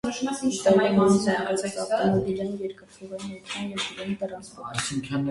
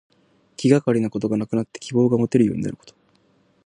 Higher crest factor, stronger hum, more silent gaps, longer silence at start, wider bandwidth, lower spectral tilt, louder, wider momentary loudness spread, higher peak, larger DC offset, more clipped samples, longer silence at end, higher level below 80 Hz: about the same, 18 dB vs 20 dB; neither; neither; second, 0.05 s vs 0.6 s; about the same, 11.5 kHz vs 10.5 kHz; second, -5 dB/octave vs -7.5 dB/octave; second, -25 LUFS vs -21 LUFS; first, 16 LU vs 11 LU; second, -6 dBFS vs -2 dBFS; neither; neither; second, 0 s vs 0.75 s; about the same, -58 dBFS vs -58 dBFS